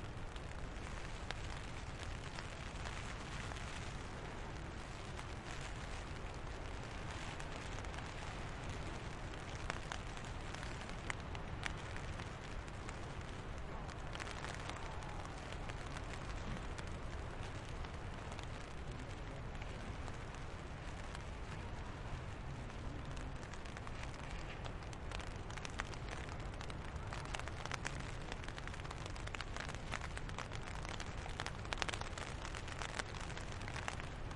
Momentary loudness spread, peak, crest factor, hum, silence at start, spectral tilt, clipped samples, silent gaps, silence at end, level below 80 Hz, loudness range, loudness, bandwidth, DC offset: 4 LU; -12 dBFS; 32 dB; none; 0 s; -4.5 dB/octave; under 0.1%; none; 0 s; -50 dBFS; 4 LU; -47 LUFS; 11.5 kHz; under 0.1%